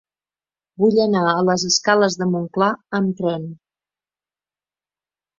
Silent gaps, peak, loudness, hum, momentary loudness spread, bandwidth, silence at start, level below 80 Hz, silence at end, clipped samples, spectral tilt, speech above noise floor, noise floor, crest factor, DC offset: none; -2 dBFS; -18 LUFS; 50 Hz at -45 dBFS; 8 LU; 7.6 kHz; 0.8 s; -64 dBFS; 1.85 s; under 0.1%; -4.5 dB/octave; over 72 dB; under -90 dBFS; 20 dB; under 0.1%